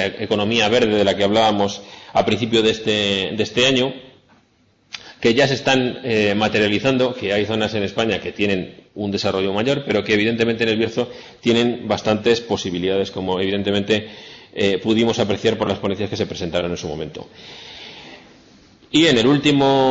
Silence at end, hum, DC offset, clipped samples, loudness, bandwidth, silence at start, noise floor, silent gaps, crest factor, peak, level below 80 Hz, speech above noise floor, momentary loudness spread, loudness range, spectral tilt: 0 s; none; under 0.1%; under 0.1%; -19 LUFS; 7.8 kHz; 0 s; -58 dBFS; none; 14 dB; -4 dBFS; -52 dBFS; 40 dB; 16 LU; 3 LU; -5 dB/octave